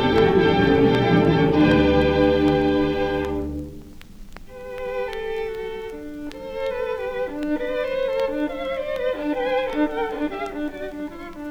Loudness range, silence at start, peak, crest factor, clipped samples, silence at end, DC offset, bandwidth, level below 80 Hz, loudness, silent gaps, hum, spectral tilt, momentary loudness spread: 12 LU; 0 s; -6 dBFS; 16 dB; under 0.1%; 0 s; under 0.1%; 13 kHz; -38 dBFS; -22 LUFS; none; none; -7.5 dB/octave; 17 LU